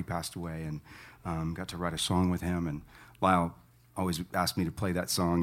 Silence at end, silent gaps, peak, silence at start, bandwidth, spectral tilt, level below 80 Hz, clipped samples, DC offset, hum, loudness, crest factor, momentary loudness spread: 0 s; none; -10 dBFS; 0 s; 16.5 kHz; -5 dB/octave; -52 dBFS; under 0.1%; under 0.1%; none; -32 LUFS; 22 dB; 13 LU